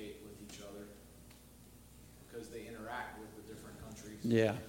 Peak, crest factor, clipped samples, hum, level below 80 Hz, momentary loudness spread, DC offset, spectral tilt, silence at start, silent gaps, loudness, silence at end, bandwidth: -18 dBFS; 24 dB; under 0.1%; none; -62 dBFS; 23 LU; under 0.1%; -6 dB/octave; 0 s; none; -42 LUFS; 0 s; 16.5 kHz